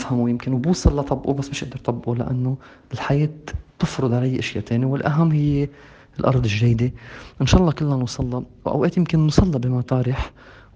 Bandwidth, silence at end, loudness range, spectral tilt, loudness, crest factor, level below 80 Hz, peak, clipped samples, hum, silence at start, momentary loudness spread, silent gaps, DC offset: 8.8 kHz; 0.25 s; 4 LU; -7 dB/octave; -21 LUFS; 20 dB; -34 dBFS; 0 dBFS; under 0.1%; none; 0 s; 11 LU; none; under 0.1%